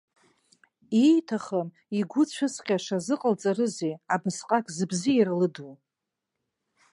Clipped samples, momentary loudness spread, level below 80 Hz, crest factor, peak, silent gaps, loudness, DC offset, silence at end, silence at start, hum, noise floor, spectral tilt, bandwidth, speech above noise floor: under 0.1%; 9 LU; -76 dBFS; 18 dB; -8 dBFS; none; -26 LUFS; under 0.1%; 1.2 s; 0.9 s; none; -85 dBFS; -5.5 dB/octave; 11.5 kHz; 60 dB